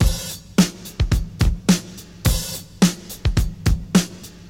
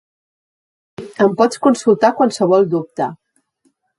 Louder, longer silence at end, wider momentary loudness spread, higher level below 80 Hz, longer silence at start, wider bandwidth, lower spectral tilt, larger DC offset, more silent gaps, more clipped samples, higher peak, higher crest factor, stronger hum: second, -21 LUFS vs -15 LUFS; second, 0 s vs 0.85 s; second, 7 LU vs 11 LU; first, -26 dBFS vs -64 dBFS; second, 0 s vs 1 s; first, 16.5 kHz vs 11.5 kHz; about the same, -5 dB/octave vs -6 dB/octave; first, 0.1% vs under 0.1%; neither; neither; about the same, 0 dBFS vs 0 dBFS; about the same, 20 dB vs 16 dB; neither